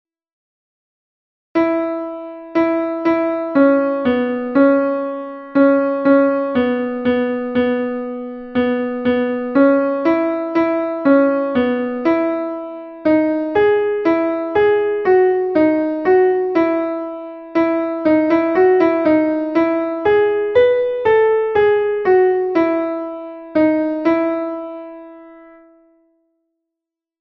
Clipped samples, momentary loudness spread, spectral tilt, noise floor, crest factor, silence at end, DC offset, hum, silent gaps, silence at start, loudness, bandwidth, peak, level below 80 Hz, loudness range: under 0.1%; 9 LU; -8 dB/octave; -84 dBFS; 16 dB; 1.8 s; under 0.1%; none; none; 1.55 s; -16 LUFS; 5.8 kHz; -2 dBFS; -54 dBFS; 5 LU